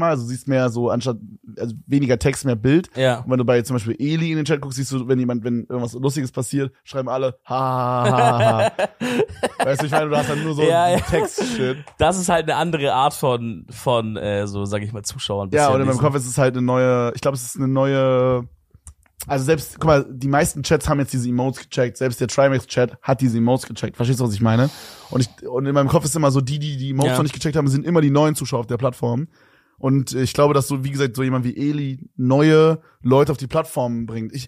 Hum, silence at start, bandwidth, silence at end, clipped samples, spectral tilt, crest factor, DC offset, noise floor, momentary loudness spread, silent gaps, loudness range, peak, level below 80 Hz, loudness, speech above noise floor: none; 0 s; 15.5 kHz; 0 s; under 0.1%; -6 dB/octave; 18 dB; under 0.1%; -47 dBFS; 8 LU; none; 2 LU; -2 dBFS; -46 dBFS; -20 LUFS; 27 dB